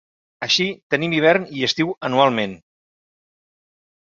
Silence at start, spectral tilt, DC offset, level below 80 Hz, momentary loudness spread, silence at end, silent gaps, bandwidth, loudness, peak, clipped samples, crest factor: 0.4 s; -4 dB/octave; under 0.1%; -62 dBFS; 8 LU; 1.6 s; 0.83-0.90 s; 7.8 kHz; -19 LUFS; -2 dBFS; under 0.1%; 20 dB